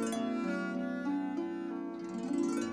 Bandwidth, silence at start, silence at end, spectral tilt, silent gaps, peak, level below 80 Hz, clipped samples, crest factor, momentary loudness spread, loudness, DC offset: 13 kHz; 0 s; 0 s; -5.5 dB/octave; none; -22 dBFS; -76 dBFS; under 0.1%; 12 dB; 6 LU; -36 LUFS; under 0.1%